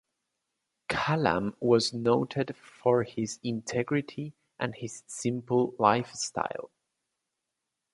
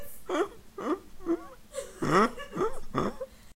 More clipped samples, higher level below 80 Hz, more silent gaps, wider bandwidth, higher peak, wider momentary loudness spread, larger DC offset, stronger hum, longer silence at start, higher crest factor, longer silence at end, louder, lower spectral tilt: neither; second, -64 dBFS vs -46 dBFS; neither; second, 11.5 kHz vs 16 kHz; about the same, -8 dBFS vs -8 dBFS; about the same, 14 LU vs 16 LU; neither; neither; first, 0.9 s vs 0 s; about the same, 22 dB vs 24 dB; first, 1.25 s vs 0.05 s; about the same, -29 LUFS vs -31 LUFS; about the same, -5 dB/octave vs -5.5 dB/octave